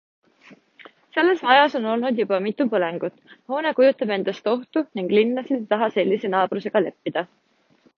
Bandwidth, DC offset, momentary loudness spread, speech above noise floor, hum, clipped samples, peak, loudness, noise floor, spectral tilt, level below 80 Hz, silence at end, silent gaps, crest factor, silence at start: 6.6 kHz; under 0.1%; 11 LU; 39 dB; none; under 0.1%; -2 dBFS; -22 LUFS; -60 dBFS; -7 dB/octave; -76 dBFS; 0.75 s; none; 20 dB; 0.5 s